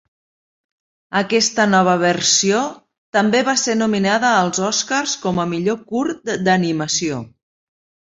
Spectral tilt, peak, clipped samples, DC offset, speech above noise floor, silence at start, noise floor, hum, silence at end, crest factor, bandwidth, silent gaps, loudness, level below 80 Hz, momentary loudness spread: -3.5 dB/octave; -2 dBFS; under 0.1%; under 0.1%; over 73 dB; 1.1 s; under -90 dBFS; none; 0.9 s; 16 dB; 8 kHz; 2.98-3.13 s; -17 LUFS; -58 dBFS; 8 LU